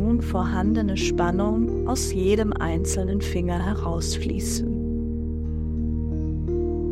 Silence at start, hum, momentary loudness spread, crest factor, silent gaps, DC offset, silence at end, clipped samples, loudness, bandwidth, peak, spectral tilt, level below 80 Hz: 0 s; none; 5 LU; 16 dB; none; under 0.1%; 0 s; under 0.1%; -25 LUFS; 14.5 kHz; -8 dBFS; -6 dB/octave; -30 dBFS